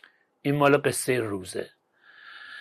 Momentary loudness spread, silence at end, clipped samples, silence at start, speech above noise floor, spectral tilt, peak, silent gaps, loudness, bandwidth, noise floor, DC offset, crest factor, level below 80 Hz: 23 LU; 0 s; under 0.1%; 0.45 s; 30 dB; -5 dB/octave; -8 dBFS; none; -25 LUFS; 13.5 kHz; -55 dBFS; under 0.1%; 20 dB; -68 dBFS